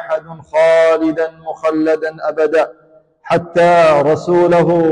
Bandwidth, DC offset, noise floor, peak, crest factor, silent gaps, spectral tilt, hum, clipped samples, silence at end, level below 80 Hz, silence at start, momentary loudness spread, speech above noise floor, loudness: 10 kHz; under 0.1%; -40 dBFS; -4 dBFS; 10 dB; none; -6.5 dB/octave; none; under 0.1%; 0 s; -54 dBFS; 0 s; 10 LU; 28 dB; -13 LUFS